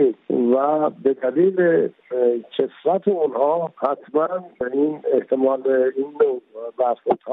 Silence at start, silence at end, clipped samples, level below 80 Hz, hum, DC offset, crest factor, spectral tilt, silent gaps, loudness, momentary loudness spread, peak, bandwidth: 0 s; 0 s; under 0.1%; -70 dBFS; none; under 0.1%; 14 dB; -10.5 dB/octave; none; -21 LUFS; 7 LU; -6 dBFS; 3.9 kHz